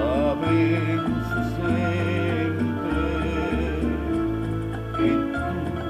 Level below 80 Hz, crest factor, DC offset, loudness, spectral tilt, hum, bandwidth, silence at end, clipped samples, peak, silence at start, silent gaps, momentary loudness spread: -36 dBFS; 14 dB; under 0.1%; -24 LUFS; -8 dB/octave; none; 15 kHz; 0 s; under 0.1%; -10 dBFS; 0 s; none; 5 LU